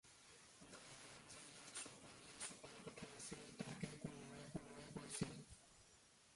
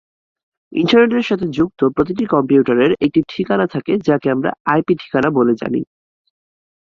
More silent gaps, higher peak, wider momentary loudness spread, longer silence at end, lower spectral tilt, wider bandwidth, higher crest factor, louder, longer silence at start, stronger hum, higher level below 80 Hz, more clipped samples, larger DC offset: second, none vs 4.60-4.65 s; second, -32 dBFS vs -2 dBFS; first, 13 LU vs 7 LU; second, 0 s vs 1.05 s; second, -3.5 dB/octave vs -7.5 dB/octave; first, 11.5 kHz vs 7.2 kHz; first, 24 dB vs 16 dB; second, -54 LUFS vs -16 LUFS; second, 0.05 s vs 0.7 s; neither; second, -76 dBFS vs -52 dBFS; neither; neither